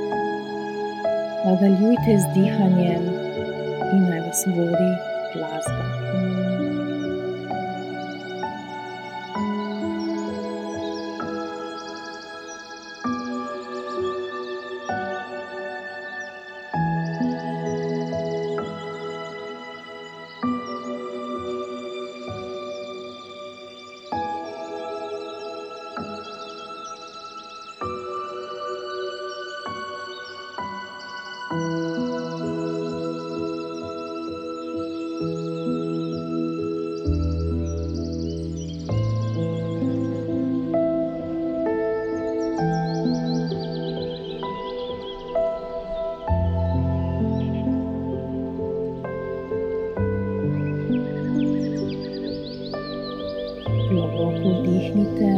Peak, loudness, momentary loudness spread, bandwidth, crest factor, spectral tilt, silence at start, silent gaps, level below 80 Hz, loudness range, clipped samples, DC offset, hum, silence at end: -6 dBFS; -26 LUFS; 12 LU; 15.5 kHz; 20 dB; -6.5 dB/octave; 0 s; none; -44 dBFS; 10 LU; under 0.1%; under 0.1%; none; 0 s